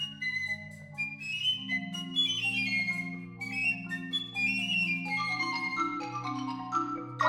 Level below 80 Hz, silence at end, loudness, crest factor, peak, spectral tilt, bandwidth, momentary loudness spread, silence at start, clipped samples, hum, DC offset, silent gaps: -70 dBFS; 0 s; -31 LUFS; 18 dB; -14 dBFS; -3 dB/octave; 17 kHz; 8 LU; 0 s; under 0.1%; none; under 0.1%; none